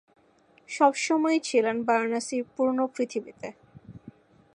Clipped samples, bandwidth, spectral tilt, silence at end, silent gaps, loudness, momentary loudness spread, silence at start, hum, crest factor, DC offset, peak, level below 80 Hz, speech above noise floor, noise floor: under 0.1%; 11 kHz; -3.5 dB/octave; 0.45 s; none; -26 LUFS; 17 LU; 0.7 s; none; 20 dB; under 0.1%; -8 dBFS; -70 dBFS; 35 dB; -61 dBFS